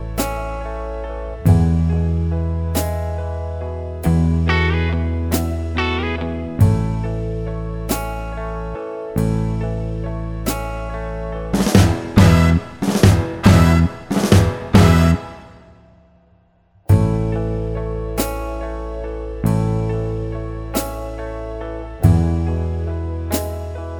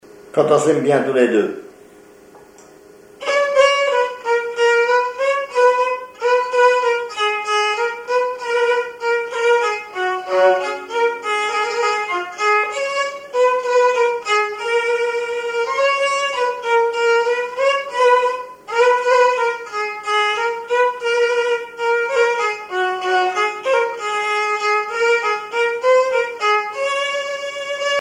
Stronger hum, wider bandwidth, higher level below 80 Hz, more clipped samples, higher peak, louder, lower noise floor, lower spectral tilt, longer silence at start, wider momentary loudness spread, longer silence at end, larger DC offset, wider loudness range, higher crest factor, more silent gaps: neither; first, over 20 kHz vs 11 kHz; first, -26 dBFS vs -66 dBFS; neither; about the same, 0 dBFS vs -2 dBFS; about the same, -19 LUFS vs -18 LUFS; first, -55 dBFS vs -44 dBFS; first, -6.5 dB/octave vs -3 dB/octave; second, 0 s vs 0.15 s; first, 14 LU vs 7 LU; about the same, 0 s vs 0 s; neither; first, 9 LU vs 2 LU; about the same, 18 dB vs 16 dB; neither